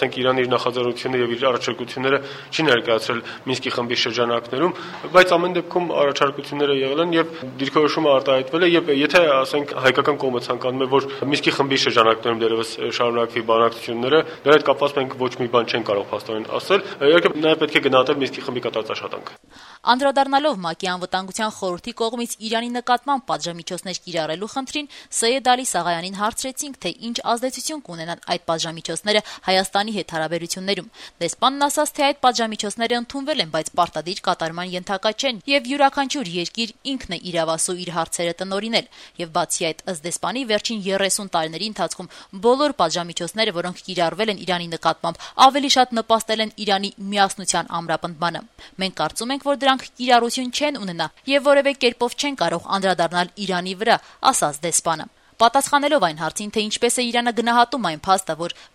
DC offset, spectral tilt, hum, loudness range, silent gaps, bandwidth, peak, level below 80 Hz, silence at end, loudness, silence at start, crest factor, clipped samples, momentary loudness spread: under 0.1%; -3 dB/octave; none; 5 LU; none; 15.5 kHz; 0 dBFS; -60 dBFS; 0.1 s; -20 LUFS; 0 s; 20 dB; under 0.1%; 10 LU